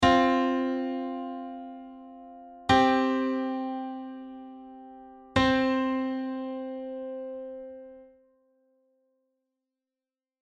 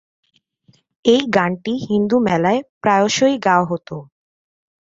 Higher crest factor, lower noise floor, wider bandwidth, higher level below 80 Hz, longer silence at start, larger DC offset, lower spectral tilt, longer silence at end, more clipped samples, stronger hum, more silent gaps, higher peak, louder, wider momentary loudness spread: about the same, 22 dB vs 18 dB; first, under -90 dBFS vs -57 dBFS; first, 9.4 kHz vs 7.8 kHz; about the same, -54 dBFS vs -56 dBFS; second, 0 s vs 1.05 s; neither; about the same, -5.5 dB/octave vs -5 dB/octave; first, 2.4 s vs 0.9 s; neither; neither; second, none vs 2.69-2.81 s; second, -8 dBFS vs -2 dBFS; second, -28 LUFS vs -17 LUFS; first, 24 LU vs 9 LU